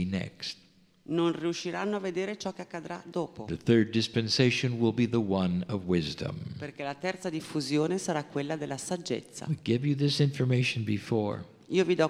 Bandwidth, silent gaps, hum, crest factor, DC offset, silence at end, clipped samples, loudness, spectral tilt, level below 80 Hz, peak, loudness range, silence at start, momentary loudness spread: 13.5 kHz; none; none; 20 dB; under 0.1%; 0 s; under 0.1%; -30 LUFS; -5.5 dB/octave; -62 dBFS; -10 dBFS; 5 LU; 0 s; 11 LU